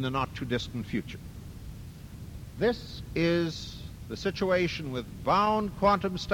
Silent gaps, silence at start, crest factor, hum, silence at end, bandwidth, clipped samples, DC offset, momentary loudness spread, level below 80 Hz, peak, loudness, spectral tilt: none; 0 s; 20 dB; none; 0 s; 17 kHz; under 0.1%; under 0.1%; 19 LU; -48 dBFS; -10 dBFS; -29 LUFS; -6 dB/octave